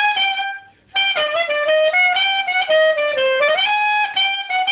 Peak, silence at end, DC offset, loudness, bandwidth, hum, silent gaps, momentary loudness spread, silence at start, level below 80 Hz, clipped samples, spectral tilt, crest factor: -6 dBFS; 0 s; under 0.1%; -16 LUFS; 4 kHz; none; none; 5 LU; 0 s; -66 dBFS; under 0.1%; -3 dB/octave; 12 dB